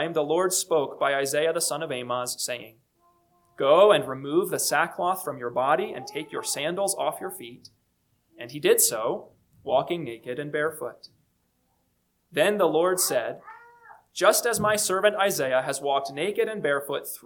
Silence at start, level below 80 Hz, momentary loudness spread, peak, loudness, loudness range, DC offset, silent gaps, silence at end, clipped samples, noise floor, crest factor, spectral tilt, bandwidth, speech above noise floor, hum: 0 s; -70 dBFS; 14 LU; -6 dBFS; -25 LUFS; 5 LU; under 0.1%; none; 0.1 s; under 0.1%; -72 dBFS; 20 dB; -2.5 dB/octave; 19 kHz; 47 dB; 60 Hz at -70 dBFS